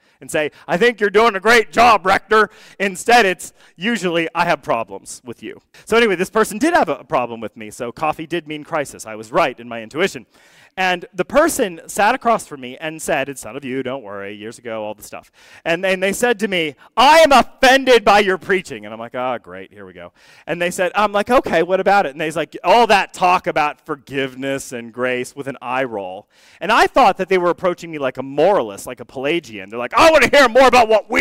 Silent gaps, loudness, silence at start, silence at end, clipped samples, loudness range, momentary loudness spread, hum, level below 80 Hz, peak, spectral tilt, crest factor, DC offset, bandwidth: none; -16 LUFS; 0.2 s; 0 s; under 0.1%; 8 LU; 18 LU; none; -46 dBFS; -2 dBFS; -3.5 dB/octave; 14 dB; under 0.1%; 16 kHz